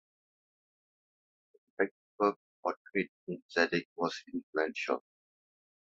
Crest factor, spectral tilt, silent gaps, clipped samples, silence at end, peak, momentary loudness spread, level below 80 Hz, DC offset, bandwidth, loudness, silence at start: 24 dB; -3 dB/octave; 1.91-2.18 s, 2.36-2.63 s, 2.77-2.85 s, 3.08-3.27 s, 3.42-3.49 s, 3.85-3.96 s, 4.43-4.53 s; under 0.1%; 0.95 s; -14 dBFS; 8 LU; -78 dBFS; under 0.1%; 7.4 kHz; -35 LUFS; 1.8 s